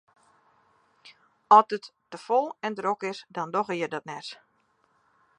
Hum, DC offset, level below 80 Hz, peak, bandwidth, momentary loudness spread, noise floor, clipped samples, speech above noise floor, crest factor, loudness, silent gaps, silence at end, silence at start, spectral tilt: none; under 0.1%; -84 dBFS; -4 dBFS; 10 kHz; 20 LU; -69 dBFS; under 0.1%; 43 dB; 24 dB; -25 LUFS; none; 1.05 s; 1.5 s; -5 dB/octave